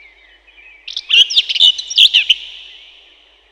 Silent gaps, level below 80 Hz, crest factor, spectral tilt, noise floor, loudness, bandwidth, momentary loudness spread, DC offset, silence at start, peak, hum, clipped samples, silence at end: none; -60 dBFS; 16 dB; 4.5 dB/octave; -48 dBFS; -9 LUFS; 19.5 kHz; 18 LU; under 0.1%; 0.85 s; 0 dBFS; none; under 0.1%; 0.9 s